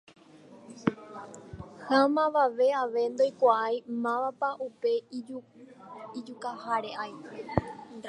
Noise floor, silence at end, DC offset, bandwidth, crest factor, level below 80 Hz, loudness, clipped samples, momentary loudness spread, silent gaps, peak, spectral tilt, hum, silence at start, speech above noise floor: -53 dBFS; 0 s; under 0.1%; 10.5 kHz; 22 dB; -58 dBFS; -29 LUFS; under 0.1%; 20 LU; none; -8 dBFS; -6 dB/octave; none; 0.5 s; 24 dB